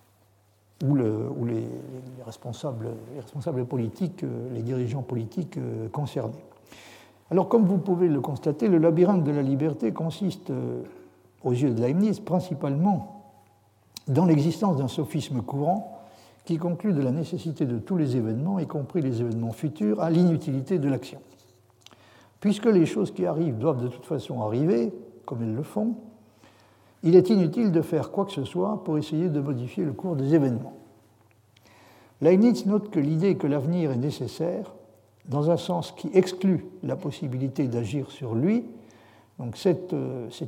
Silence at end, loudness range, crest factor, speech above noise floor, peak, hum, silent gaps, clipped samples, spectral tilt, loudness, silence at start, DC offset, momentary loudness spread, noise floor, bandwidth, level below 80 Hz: 0 s; 7 LU; 20 dB; 37 dB; -6 dBFS; none; none; under 0.1%; -8.5 dB/octave; -26 LUFS; 0.8 s; under 0.1%; 12 LU; -62 dBFS; 15.5 kHz; -70 dBFS